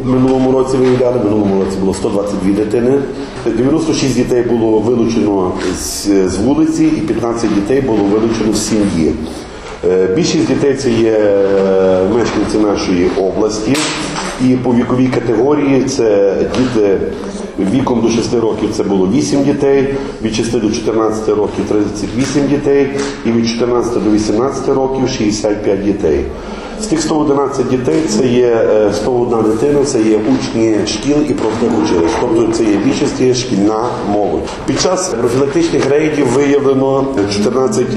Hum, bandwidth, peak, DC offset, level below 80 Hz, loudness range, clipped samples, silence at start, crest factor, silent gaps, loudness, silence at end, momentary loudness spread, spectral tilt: none; 13 kHz; -2 dBFS; under 0.1%; -34 dBFS; 2 LU; under 0.1%; 0 s; 10 dB; none; -13 LUFS; 0 s; 5 LU; -5.5 dB/octave